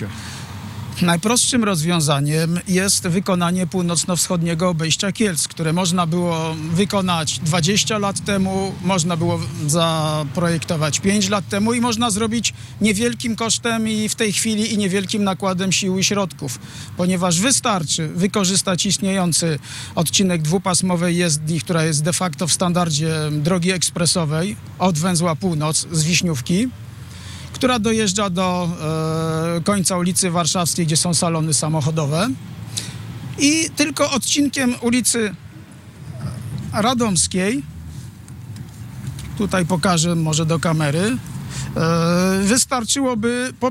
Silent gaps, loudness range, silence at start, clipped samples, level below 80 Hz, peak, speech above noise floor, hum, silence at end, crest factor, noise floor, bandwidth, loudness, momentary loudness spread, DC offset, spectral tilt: none; 2 LU; 0 s; under 0.1%; -50 dBFS; -8 dBFS; 20 dB; none; 0 s; 12 dB; -39 dBFS; 16 kHz; -18 LUFS; 12 LU; under 0.1%; -4 dB/octave